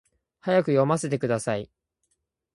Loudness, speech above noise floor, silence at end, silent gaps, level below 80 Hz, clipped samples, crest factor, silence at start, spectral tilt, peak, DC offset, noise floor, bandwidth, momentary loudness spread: -25 LUFS; 53 dB; 0.9 s; none; -64 dBFS; under 0.1%; 18 dB; 0.45 s; -6 dB/octave; -8 dBFS; under 0.1%; -76 dBFS; 11.5 kHz; 12 LU